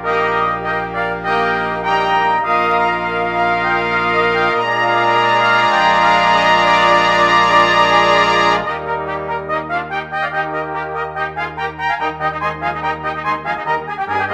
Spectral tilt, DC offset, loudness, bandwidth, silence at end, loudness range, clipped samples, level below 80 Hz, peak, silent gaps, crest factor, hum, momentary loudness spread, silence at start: -4 dB/octave; under 0.1%; -15 LUFS; 12 kHz; 0 s; 9 LU; under 0.1%; -44 dBFS; 0 dBFS; none; 16 dB; none; 10 LU; 0 s